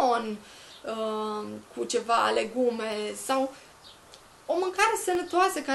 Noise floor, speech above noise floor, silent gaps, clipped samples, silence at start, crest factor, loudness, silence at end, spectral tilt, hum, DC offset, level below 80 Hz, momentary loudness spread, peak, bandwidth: -52 dBFS; 24 dB; none; under 0.1%; 0 s; 18 dB; -28 LUFS; 0 s; -2.5 dB/octave; none; under 0.1%; -66 dBFS; 16 LU; -10 dBFS; 12.5 kHz